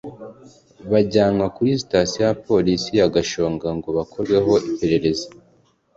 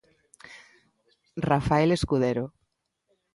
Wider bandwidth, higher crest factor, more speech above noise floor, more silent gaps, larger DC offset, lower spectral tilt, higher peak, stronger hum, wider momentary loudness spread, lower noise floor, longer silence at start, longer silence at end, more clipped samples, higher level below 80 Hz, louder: second, 7.8 kHz vs 11.5 kHz; about the same, 16 dB vs 20 dB; second, 39 dB vs 53 dB; neither; neither; second, -5.5 dB/octave vs -7 dB/octave; first, -4 dBFS vs -8 dBFS; neither; second, 10 LU vs 24 LU; second, -58 dBFS vs -77 dBFS; second, 0.05 s vs 0.5 s; second, 0.7 s vs 0.85 s; neither; about the same, -46 dBFS vs -48 dBFS; first, -20 LUFS vs -25 LUFS